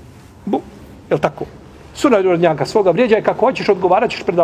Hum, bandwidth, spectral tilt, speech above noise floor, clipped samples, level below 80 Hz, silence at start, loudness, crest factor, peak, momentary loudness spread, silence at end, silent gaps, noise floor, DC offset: none; 14 kHz; -6 dB/octave; 23 dB; under 0.1%; -48 dBFS; 0.45 s; -16 LUFS; 16 dB; 0 dBFS; 13 LU; 0 s; none; -38 dBFS; under 0.1%